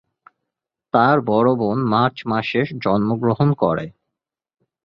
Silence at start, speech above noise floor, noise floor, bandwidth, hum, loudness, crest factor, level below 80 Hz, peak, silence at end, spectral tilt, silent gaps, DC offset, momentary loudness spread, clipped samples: 0.95 s; 64 dB; -82 dBFS; 6.2 kHz; none; -19 LUFS; 18 dB; -54 dBFS; -2 dBFS; 0.95 s; -9.5 dB/octave; none; under 0.1%; 6 LU; under 0.1%